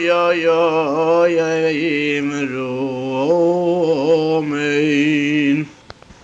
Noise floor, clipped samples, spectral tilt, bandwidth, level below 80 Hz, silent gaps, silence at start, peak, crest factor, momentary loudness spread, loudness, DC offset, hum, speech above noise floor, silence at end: -41 dBFS; under 0.1%; -6 dB/octave; 8.2 kHz; -58 dBFS; none; 0 s; -4 dBFS; 12 dB; 7 LU; -17 LUFS; under 0.1%; none; 25 dB; 0.5 s